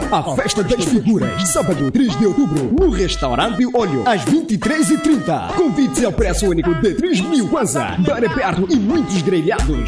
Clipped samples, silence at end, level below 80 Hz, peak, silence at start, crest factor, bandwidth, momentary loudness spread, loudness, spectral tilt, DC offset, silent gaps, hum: under 0.1%; 0 s; -30 dBFS; -4 dBFS; 0 s; 12 dB; 11 kHz; 3 LU; -16 LUFS; -5 dB/octave; under 0.1%; none; none